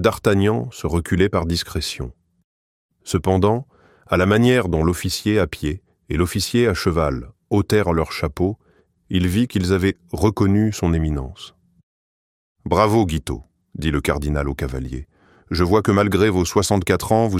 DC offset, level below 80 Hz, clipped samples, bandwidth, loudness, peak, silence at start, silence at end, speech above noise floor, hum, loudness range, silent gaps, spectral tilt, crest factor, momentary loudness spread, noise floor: under 0.1%; -34 dBFS; under 0.1%; 16 kHz; -20 LUFS; -2 dBFS; 0 s; 0 s; over 71 dB; none; 3 LU; 2.44-2.89 s, 11.83-12.55 s; -6 dB/octave; 18 dB; 13 LU; under -90 dBFS